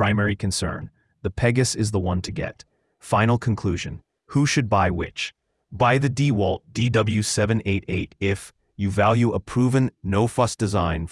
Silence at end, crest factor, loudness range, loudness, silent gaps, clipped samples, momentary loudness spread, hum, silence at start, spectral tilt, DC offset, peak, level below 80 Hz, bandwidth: 0 s; 18 dB; 2 LU; -23 LUFS; none; under 0.1%; 11 LU; none; 0 s; -5.5 dB/octave; under 0.1%; -4 dBFS; -46 dBFS; 12 kHz